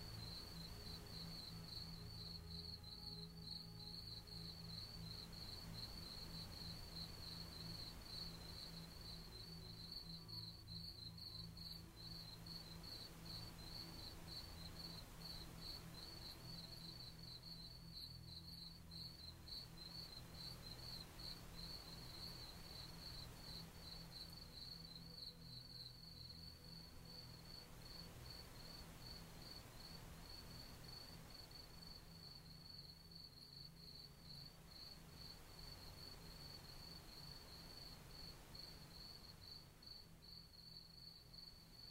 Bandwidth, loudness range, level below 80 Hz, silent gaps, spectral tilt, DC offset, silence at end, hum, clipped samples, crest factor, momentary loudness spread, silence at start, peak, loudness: 16 kHz; 5 LU; -64 dBFS; none; -4 dB/octave; under 0.1%; 0 s; none; under 0.1%; 16 dB; 6 LU; 0 s; -40 dBFS; -54 LUFS